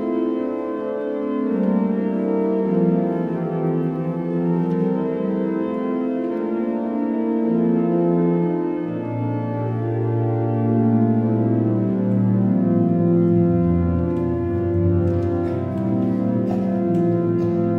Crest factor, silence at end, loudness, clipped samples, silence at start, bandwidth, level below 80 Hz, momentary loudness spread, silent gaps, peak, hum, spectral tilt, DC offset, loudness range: 14 dB; 0 s; -21 LUFS; under 0.1%; 0 s; 4 kHz; -46 dBFS; 6 LU; none; -6 dBFS; none; -11.5 dB/octave; under 0.1%; 3 LU